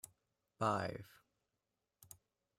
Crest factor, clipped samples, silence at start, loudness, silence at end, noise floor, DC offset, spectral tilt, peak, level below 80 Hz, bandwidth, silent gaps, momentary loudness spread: 24 dB; under 0.1%; 0.6 s; -40 LUFS; 1.5 s; -89 dBFS; under 0.1%; -5.5 dB/octave; -22 dBFS; -78 dBFS; 16 kHz; none; 23 LU